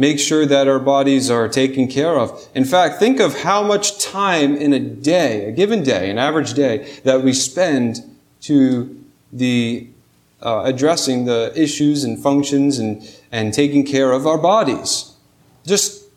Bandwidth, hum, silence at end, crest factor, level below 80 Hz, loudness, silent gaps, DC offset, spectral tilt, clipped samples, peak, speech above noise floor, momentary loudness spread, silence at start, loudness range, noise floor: 15.5 kHz; none; 0.2 s; 16 dB; -60 dBFS; -16 LUFS; none; under 0.1%; -4 dB/octave; under 0.1%; -2 dBFS; 37 dB; 8 LU; 0 s; 3 LU; -53 dBFS